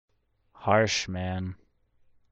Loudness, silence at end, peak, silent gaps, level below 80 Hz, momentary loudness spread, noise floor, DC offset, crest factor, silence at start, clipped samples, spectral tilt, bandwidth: -27 LUFS; 0.8 s; -8 dBFS; none; -58 dBFS; 12 LU; -64 dBFS; under 0.1%; 22 dB; 0.6 s; under 0.1%; -4.5 dB/octave; 8.4 kHz